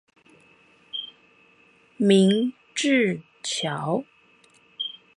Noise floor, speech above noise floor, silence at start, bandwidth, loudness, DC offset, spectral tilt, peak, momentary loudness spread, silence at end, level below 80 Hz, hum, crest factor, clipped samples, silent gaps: -58 dBFS; 37 dB; 0.95 s; 11.5 kHz; -24 LUFS; under 0.1%; -5 dB/octave; -6 dBFS; 16 LU; 0.25 s; -74 dBFS; none; 20 dB; under 0.1%; none